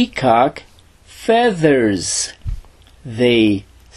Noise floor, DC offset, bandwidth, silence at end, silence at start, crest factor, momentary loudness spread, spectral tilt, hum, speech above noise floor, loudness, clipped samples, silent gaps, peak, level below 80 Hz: -45 dBFS; under 0.1%; 13 kHz; 0.35 s; 0 s; 16 dB; 17 LU; -4.5 dB/octave; none; 30 dB; -16 LUFS; under 0.1%; none; 0 dBFS; -38 dBFS